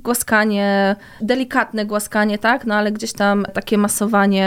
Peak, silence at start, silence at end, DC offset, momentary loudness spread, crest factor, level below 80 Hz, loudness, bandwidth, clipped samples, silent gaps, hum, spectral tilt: -4 dBFS; 0.05 s; 0 s; under 0.1%; 5 LU; 14 dB; -52 dBFS; -18 LUFS; 16.5 kHz; under 0.1%; none; none; -4.5 dB/octave